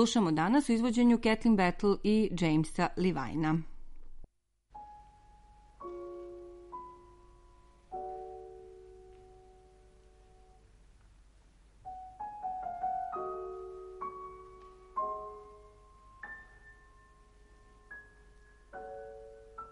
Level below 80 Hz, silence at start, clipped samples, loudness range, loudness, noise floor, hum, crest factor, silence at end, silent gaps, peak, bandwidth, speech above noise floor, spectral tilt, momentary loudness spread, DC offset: -52 dBFS; 0 s; under 0.1%; 23 LU; -32 LUFS; -68 dBFS; none; 20 dB; 0 s; none; -14 dBFS; 11.5 kHz; 39 dB; -6 dB/octave; 25 LU; under 0.1%